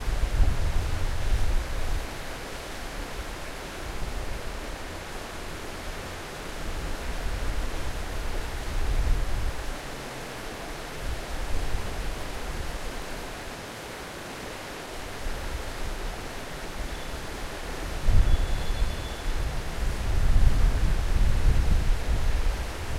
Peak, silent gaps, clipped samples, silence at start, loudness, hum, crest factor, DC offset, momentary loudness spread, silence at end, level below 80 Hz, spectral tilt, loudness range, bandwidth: -6 dBFS; none; under 0.1%; 0 s; -32 LUFS; none; 20 dB; under 0.1%; 10 LU; 0 s; -28 dBFS; -4.5 dB/octave; 8 LU; 15 kHz